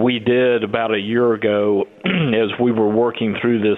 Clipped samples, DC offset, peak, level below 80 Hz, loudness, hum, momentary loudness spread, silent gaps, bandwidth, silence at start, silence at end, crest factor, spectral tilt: under 0.1%; under 0.1%; -4 dBFS; -58 dBFS; -18 LUFS; none; 3 LU; none; 4.1 kHz; 0 s; 0 s; 14 dB; -9 dB/octave